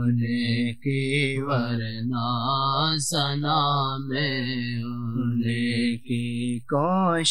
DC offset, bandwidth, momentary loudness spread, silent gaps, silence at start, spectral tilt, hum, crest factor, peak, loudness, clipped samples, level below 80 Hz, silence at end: 0.7%; 12.5 kHz; 6 LU; none; 0 s; -5 dB/octave; none; 16 dB; -10 dBFS; -25 LUFS; under 0.1%; -64 dBFS; 0 s